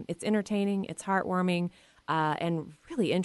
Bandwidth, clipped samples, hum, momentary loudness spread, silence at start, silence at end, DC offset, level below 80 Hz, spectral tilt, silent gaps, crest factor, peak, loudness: 11.5 kHz; under 0.1%; none; 8 LU; 0 s; 0 s; under 0.1%; -68 dBFS; -6 dB/octave; none; 14 dB; -16 dBFS; -30 LUFS